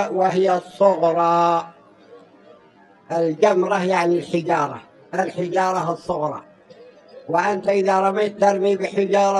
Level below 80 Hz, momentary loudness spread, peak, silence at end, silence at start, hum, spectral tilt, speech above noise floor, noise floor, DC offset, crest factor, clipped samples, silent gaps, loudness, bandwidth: -68 dBFS; 9 LU; -2 dBFS; 0 s; 0 s; none; -6 dB/octave; 32 dB; -51 dBFS; under 0.1%; 18 dB; under 0.1%; none; -20 LUFS; 11.5 kHz